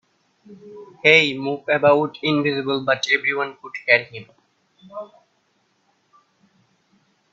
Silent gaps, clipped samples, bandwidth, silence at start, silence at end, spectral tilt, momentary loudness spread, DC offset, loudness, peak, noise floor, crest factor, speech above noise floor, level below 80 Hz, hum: none; under 0.1%; 7.8 kHz; 0.5 s; 2.3 s; -4.5 dB/octave; 23 LU; under 0.1%; -18 LUFS; 0 dBFS; -66 dBFS; 22 dB; 45 dB; -68 dBFS; none